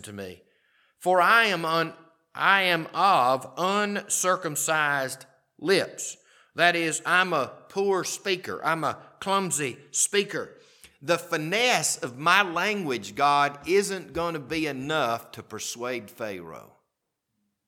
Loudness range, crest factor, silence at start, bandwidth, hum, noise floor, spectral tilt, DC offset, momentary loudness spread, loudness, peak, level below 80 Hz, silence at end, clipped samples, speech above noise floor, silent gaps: 5 LU; 22 dB; 0.05 s; 19 kHz; none; -81 dBFS; -2.5 dB/octave; under 0.1%; 14 LU; -25 LUFS; -4 dBFS; -66 dBFS; 1.05 s; under 0.1%; 55 dB; none